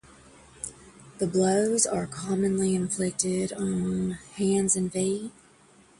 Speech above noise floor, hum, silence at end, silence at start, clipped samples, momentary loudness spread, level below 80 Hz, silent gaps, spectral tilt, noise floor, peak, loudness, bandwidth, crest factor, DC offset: 31 dB; none; 0.7 s; 0.65 s; under 0.1%; 12 LU; -58 dBFS; none; -5 dB/octave; -57 dBFS; -6 dBFS; -26 LUFS; 11.5 kHz; 22 dB; under 0.1%